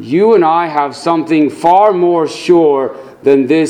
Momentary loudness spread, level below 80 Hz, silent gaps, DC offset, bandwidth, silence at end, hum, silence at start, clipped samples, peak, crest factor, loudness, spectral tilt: 7 LU; -58 dBFS; none; under 0.1%; 11 kHz; 0 s; none; 0 s; 0.2%; 0 dBFS; 10 dB; -11 LUFS; -6.5 dB/octave